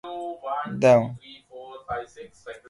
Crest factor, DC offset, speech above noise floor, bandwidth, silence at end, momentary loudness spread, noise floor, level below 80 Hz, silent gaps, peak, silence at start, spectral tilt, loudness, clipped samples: 22 dB; under 0.1%; 20 dB; 11.5 kHz; 0.1 s; 25 LU; -43 dBFS; -58 dBFS; none; -4 dBFS; 0.05 s; -6.5 dB/octave; -24 LUFS; under 0.1%